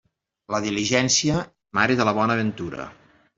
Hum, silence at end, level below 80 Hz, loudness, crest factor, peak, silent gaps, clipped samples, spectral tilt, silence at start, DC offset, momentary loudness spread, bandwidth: none; 0.45 s; -56 dBFS; -22 LUFS; 20 dB; -4 dBFS; none; under 0.1%; -3.5 dB/octave; 0.5 s; under 0.1%; 14 LU; 8 kHz